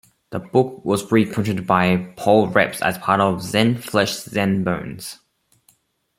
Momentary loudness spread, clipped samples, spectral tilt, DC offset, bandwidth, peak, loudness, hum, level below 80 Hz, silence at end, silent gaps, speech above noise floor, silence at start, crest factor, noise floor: 10 LU; under 0.1%; -5.5 dB/octave; under 0.1%; 16.5 kHz; 0 dBFS; -19 LUFS; none; -56 dBFS; 1.05 s; none; 41 dB; 0.3 s; 20 dB; -60 dBFS